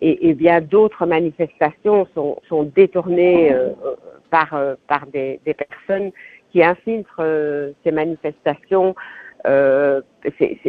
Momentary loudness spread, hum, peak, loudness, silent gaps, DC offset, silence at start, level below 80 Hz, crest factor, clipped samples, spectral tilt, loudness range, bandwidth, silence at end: 11 LU; none; 0 dBFS; -18 LUFS; none; under 0.1%; 0 s; -58 dBFS; 18 dB; under 0.1%; -9.5 dB/octave; 4 LU; 4.8 kHz; 0 s